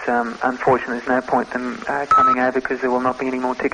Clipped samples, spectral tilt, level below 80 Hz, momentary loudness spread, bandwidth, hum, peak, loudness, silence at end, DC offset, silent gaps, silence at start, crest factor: under 0.1%; -6 dB/octave; -52 dBFS; 9 LU; 9.6 kHz; none; -4 dBFS; -19 LUFS; 0 s; under 0.1%; none; 0 s; 16 dB